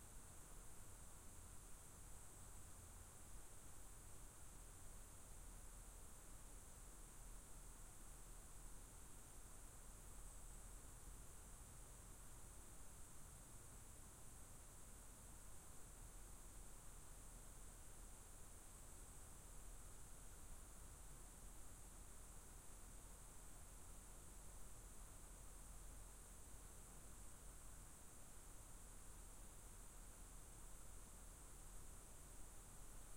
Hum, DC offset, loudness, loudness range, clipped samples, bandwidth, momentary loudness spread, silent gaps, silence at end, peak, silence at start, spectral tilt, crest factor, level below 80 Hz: none; under 0.1%; -61 LUFS; 0 LU; under 0.1%; 16.5 kHz; 1 LU; none; 0 s; -44 dBFS; 0 s; -3 dB/octave; 14 dB; -62 dBFS